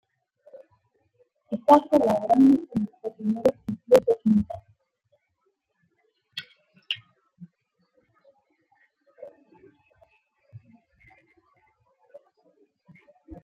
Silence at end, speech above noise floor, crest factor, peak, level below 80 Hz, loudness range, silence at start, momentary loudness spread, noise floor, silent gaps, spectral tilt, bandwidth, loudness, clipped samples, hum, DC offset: 0.1 s; 55 dB; 24 dB; -4 dBFS; -62 dBFS; 19 LU; 1.5 s; 21 LU; -75 dBFS; none; -7 dB/octave; 15.5 kHz; -23 LUFS; under 0.1%; none; under 0.1%